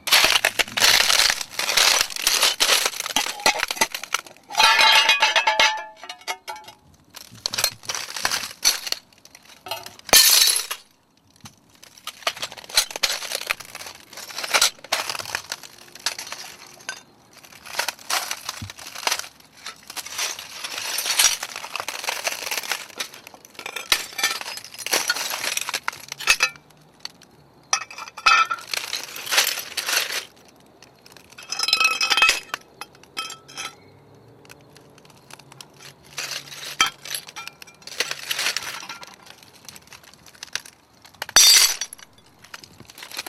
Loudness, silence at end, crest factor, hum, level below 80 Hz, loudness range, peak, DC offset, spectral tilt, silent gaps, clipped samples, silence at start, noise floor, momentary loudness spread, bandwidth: -20 LUFS; 0.05 s; 24 dB; none; -58 dBFS; 12 LU; 0 dBFS; under 0.1%; 1.5 dB/octave; none; under 0.1%; 0.05 s; -58 dBFS; 22 LU; 16.5 kHz